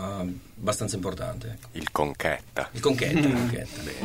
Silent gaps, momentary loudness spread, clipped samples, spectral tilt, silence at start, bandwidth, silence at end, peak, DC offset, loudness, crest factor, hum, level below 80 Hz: none; 12 LU; under 0.1%; -5 dB/octave; 0 s; 16 kHz; 0 s; -6 dBFS; 0.2%; -28 LUFS; 22 dB; none; -48 dBFS